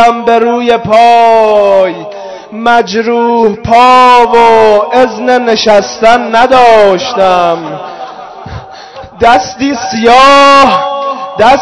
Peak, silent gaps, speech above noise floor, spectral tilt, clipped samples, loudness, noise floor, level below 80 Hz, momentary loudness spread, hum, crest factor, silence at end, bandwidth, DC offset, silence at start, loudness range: 0 dBFS; none; 22 dB; -4 dB/octave; 10%; -6 LUFS; -27 dBFS; -38 dBFS; 20 LU; none; 6 dB; 0 s; 11 kHz; under 0.1%; 0 s; 4 LU